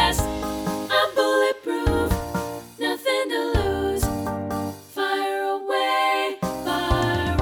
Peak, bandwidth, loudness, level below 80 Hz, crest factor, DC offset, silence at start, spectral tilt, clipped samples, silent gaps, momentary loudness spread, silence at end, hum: -6 dBFS; over 20 kHz; -24 LUFS; -34 dBFS; 18 dB; under 0.1%; 0 s; -4.5 dB/octave; under 0.1%; none; 7 LU; 0 s; none